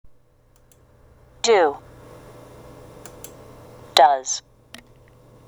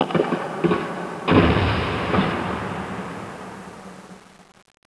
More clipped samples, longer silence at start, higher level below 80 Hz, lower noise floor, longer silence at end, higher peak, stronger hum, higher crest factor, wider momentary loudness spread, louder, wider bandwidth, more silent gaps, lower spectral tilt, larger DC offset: neither; first, 1.45 s vs 0 s; second, -56 dBFS vs -38 dBFS; first, -56 dBFS vs -45 dBFS; first, 1.1 s vs 0.5 s; about the same, 0 dBFS vs -2 dBFS; neither; about the same, 24 dB vs 20 dB; first, 29 LU vs 21 LU; first, -19 LUFS vs -22 LUFS; first, over 20 kHz vs 11 kHz; neither; second, -1.5 dB/octave vs -7 dB/octave; neither